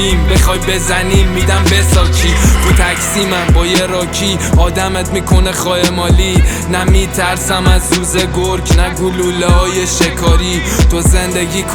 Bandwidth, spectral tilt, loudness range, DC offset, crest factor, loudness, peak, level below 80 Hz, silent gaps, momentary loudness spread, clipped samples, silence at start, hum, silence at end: 19 kHz; -4.5 dB/octave; 1 LU; under 0.1%; 10 dB; -12 LUFS; 0 dBFS; -14 dBFS; none; 4 LU; under 0.1%; 0 s; none; 0 s